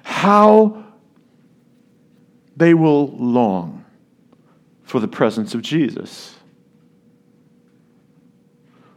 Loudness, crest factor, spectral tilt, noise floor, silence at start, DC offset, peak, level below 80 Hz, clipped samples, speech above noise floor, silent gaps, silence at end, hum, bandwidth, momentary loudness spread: -16 LUFS; 20 dB; -7 dB/octave; -54 dBFS; 0.05 s; under 0.1%; 0 dBFS; -70 dBFS; under 0.1%; 40 dB; none; 2.7 s; none; 12.5 kHz; 21 LU